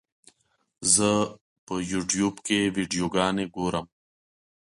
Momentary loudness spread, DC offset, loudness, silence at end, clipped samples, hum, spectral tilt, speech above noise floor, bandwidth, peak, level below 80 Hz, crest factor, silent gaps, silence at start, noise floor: 12 LU; under 0.1%; -25 LUFS; 0.85 s; under 0.1%; none; -3.5 dB/octave; 39 dB; 11.5 kHz; -6 dBFS; -56 dBFS; 22 dB; 1.41-1.67 s; 0.8 s; -65 dBFS